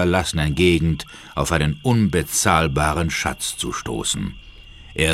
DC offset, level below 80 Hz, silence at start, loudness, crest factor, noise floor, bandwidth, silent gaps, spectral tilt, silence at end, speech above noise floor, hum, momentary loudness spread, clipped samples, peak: under 0.1%; -34 dBFS; 0 s; -20 LUFS; 20 dB; -41 dBFS; 16 kHz; none; -4.5 dB/octave; 0 s; 21 dB; none; 9 LU; under 0.1%; -2 dBFS